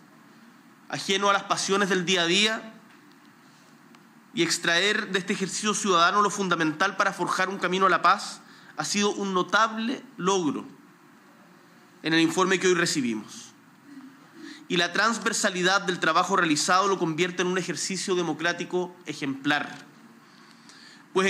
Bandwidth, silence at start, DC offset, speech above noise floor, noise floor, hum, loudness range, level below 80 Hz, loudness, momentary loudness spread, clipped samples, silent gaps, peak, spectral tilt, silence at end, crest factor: 15.5 kHz; 0.9 s; under 0.1%; 29 dB; -54 dBFS; none; 4 LU; -88 dBFS; -24 LUFS; 13 LU; under 0.1%; none; -8 dBFS; -3 dB/octave; 0 s; 18 dB